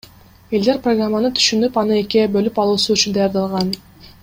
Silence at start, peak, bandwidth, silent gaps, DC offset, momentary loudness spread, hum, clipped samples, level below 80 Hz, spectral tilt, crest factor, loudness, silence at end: 0.5 s; -2 dBFS; 16.5 kHz; none; under 0.1%; 6 LU; none; under 0.1%; -50 dBFS; -4 dB/octave; 16 dB; -17 LUFS; 0.2 s